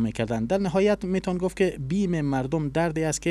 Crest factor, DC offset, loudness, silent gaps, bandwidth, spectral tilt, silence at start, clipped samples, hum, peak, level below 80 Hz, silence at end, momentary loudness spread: 14 dB; under 0.1%; -25 LUFS; none; 13 kHz; -6 dB/octave; 0 s; under 0.1%; none; -10 dBFS; -46 dBFS; 0 s; 4 LU